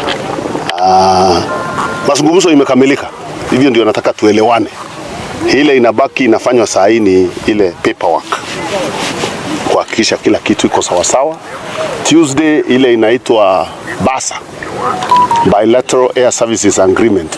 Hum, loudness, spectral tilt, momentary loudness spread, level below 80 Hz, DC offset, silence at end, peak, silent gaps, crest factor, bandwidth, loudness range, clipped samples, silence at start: none; -10 LUFS; -4 dB/octave; 10 LU; -44 dBFS; under 0.1%; 0 s; 0 dBFS; none; 10 dB; 11 kHz; 3 LU; 0.8%; 0 s